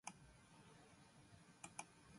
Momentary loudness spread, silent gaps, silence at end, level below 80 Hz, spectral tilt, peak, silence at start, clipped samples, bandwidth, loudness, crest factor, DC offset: 11 LU; none; 0 s; -78 dBFS; -3 dB/octave; -34 dBFS; 0.05 s; under 0.1%; 11.5 kHz; -61 LUFS; 28 dB; under 0.1%